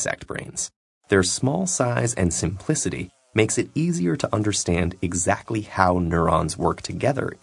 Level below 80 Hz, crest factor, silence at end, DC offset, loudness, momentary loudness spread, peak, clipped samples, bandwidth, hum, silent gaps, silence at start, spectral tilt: -48 dBFS; 22 dB; 0.05 s; under 0.1%; -23 LUFS; 8 LU; 0 dBFS; under 0.1%; 11 kHz; none; 0.76-1.01 s; 0 s; -4.5 dB/octave